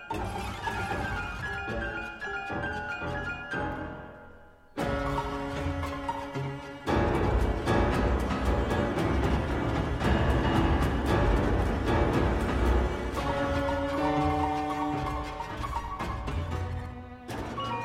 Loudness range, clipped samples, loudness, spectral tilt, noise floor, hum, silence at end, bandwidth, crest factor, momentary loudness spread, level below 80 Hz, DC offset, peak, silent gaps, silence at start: 7 LU; under 0.1%; -30 LUFS; -6.5 dB/octave; -52 dBFS; none; 0 s; 14.5 kHz; 16 dB; 9 LU; -34 dBFS; under 0.1%; -12 dBFS; none; 0 s